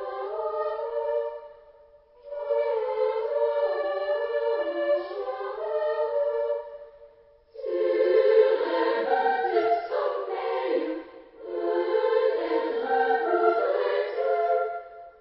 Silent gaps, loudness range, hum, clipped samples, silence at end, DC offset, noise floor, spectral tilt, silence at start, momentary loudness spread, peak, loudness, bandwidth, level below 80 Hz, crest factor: none; 5 LU; none; under 0.1%; 0.1 s; under 0.1%; -55 dBFS; -7 dB/octave; 0 s; 11 LU; -8 dBFS; -26 LUFS; 5.8 kHz; -70 dBFS; 18 dB